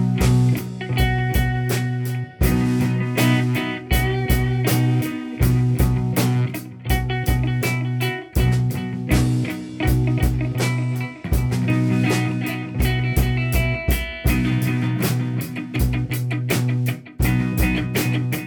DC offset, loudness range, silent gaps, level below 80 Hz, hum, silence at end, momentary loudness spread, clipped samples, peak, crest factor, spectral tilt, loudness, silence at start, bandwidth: under 0.1%; 2 LU; none; -28 dBFS; none; 0 s; 6 LU; under 0.1%; -6 dBFS; 14 dB; -6 dB/octave; -21 LUFS; 0 s; 19 kHz